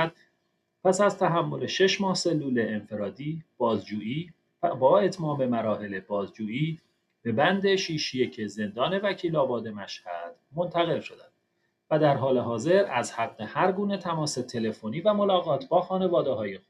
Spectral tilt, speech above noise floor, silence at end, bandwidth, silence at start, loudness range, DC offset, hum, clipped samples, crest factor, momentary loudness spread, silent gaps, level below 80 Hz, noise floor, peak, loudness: -5.5 dB/octave; 49 dB; 0.1 s; 11.5 kHz; 0 s; 3 LU; under 0.1%; none; under 0.1%; 18 dB; 11 LU; none; -72 dBFS; -75 dBFS; -8 dBFS; -27 LUFS